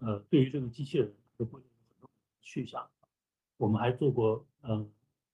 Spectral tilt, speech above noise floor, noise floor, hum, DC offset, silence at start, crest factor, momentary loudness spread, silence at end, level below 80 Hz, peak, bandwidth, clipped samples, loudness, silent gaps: -8.5 dB/octave; over 58 dB; under -90 dBFS; none; under 0.1%; 0 s; 20 dB; 14 LU; 0.45 s; -66 dBFS; -14 dBFS; 9.2 kHz; under 0.1%; -32 LUFS; none